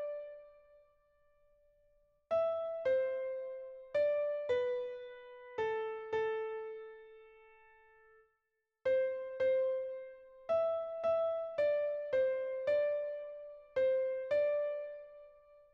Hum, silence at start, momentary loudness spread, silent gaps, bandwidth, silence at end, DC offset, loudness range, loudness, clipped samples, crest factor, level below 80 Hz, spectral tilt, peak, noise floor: none; 0 s; 15 LU; none; 6.2 kHz; 0.4 s; under 0.1%; 6 LU; -36 LUFS; under 0.1%; 14 dB; -76 dBFS; -5 dB/octave; -24 dBFS; -85 dBFS